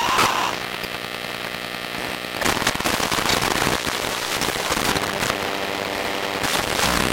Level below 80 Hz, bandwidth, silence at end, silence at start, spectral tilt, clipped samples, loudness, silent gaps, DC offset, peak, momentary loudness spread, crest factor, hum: -42 dBFS; 17 kHz; 0 s; 0 s; -2.5 dB/octave; under 0.1%; -22 LUFS; none; under 0.1%; -2 dBFS; 8 LU; 22 dB; none